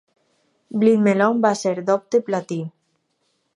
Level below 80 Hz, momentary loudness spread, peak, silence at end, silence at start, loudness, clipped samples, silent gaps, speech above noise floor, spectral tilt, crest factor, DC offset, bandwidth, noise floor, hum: -76 dBFS; 13 LU; -4 dBFS; 0.85 s; 0.7 s; -20 LUFS; under 0.1%; none; 51 dB; -6.5 dB/octave; 18 dB; under 0.1%; 11 kHz; -70 dBFS; none